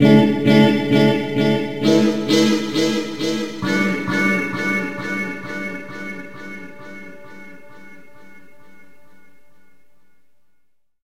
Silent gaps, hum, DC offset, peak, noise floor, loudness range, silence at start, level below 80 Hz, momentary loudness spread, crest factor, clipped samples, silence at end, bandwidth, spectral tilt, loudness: none; none; 1%; -2 dBFS; -61 dBFS; 20 LU; 0 s; -56 dBFS; 22 LU; 18 dB; under 0.1%; 0 s; 16 kHz; -5.5 dB/octave; -18 LUFS